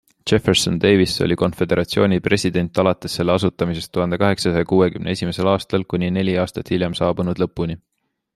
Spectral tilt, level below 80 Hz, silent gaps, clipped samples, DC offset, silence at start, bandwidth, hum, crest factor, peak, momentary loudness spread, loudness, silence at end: -5.5 dB/octave; -46 dBFS; none; under 0.1%; under 0.1%; 0.25 s; 13 kHz; none; 18 dB; 0 dBFS; 6 LU; -19 LUFS; 0.6 s